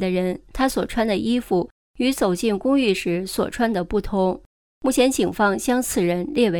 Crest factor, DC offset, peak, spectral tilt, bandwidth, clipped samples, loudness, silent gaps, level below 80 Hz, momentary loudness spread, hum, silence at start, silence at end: 16 dB; under 0.1%; -4 dBFS; -5 dB/octave; 20 kHz; under 0.1%; -22 LUFS; 1.71-1.94 s, 4.46-4.81 s; -42 dBFS; 5 LU; none; 0 s; 0 s